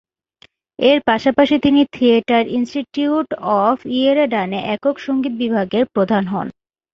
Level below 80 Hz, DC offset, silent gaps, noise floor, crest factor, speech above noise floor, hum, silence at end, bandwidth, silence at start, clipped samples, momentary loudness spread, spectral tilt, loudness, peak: -54 dBFS; under 0.1%; none; -53 dBFS; 16 dB; 37 dB; none; 0.4 s; 7.2 kHz; 0.8 s; under 0.1%; 7 LU; -6.5 dB/octave; -17 LUFS; 0 dBFS